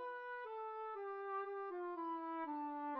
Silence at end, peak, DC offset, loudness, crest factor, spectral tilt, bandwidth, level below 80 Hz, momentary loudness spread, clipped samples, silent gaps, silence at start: 0 s; -34 dBFS; under 0.1%; -46 LUFS; 12 dB; -0.5 dB/octave; 5.8 kHz; under -90 dBFS; 3 LU; under 0.1%; none; 0 s